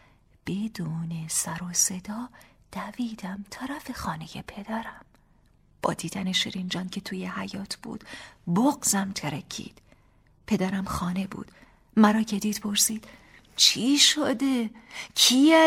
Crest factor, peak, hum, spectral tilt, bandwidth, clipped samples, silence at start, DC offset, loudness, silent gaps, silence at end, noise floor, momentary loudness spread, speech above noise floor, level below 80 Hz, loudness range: 22 dB; -6 dBFS; none; -3 dB/octave; 16 kHz; under 0.1%; 0.45 s; under 0.1%; -25 LUFS; none; 0 s; -61 dBFS; 20 LU; 35 dB; -56 dBFS; 12 LU